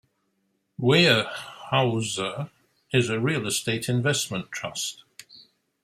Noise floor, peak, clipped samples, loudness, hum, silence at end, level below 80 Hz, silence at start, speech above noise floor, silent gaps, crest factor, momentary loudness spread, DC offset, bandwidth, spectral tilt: -73 dBFS; -4 dBFS; under 0.1%; -24 LUFS; none; 0.45 s; -64 dBFS; 0.8 s; 49 dB; none; 22 dB; 16 LU; under 0.1%; 16 kHz; -4 dB/octave